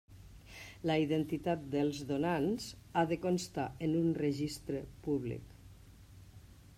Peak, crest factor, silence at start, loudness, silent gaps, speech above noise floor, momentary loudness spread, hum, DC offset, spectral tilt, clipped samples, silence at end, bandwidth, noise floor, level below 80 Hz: -20 dBFS; 16 dB; 0.1 s; -35 LUFS; none; 22 dB; 13 LU; none; under 0.1%; -6.5 dB/octave; under 0.1%; 0.05 s; 16 kHz; -56 dBFS; -60 dBFS